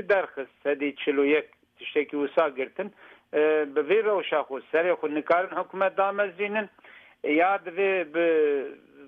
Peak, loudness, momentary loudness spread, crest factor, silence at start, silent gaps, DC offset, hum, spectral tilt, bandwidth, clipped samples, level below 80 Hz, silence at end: -10 dBFS; -26 LUFS; 10 LU; 16 dB; 0 s; none; under 0.1%; none; -7 dB/octave; 4.5 kHz; under 0.1%; -78 dBFS; 0 s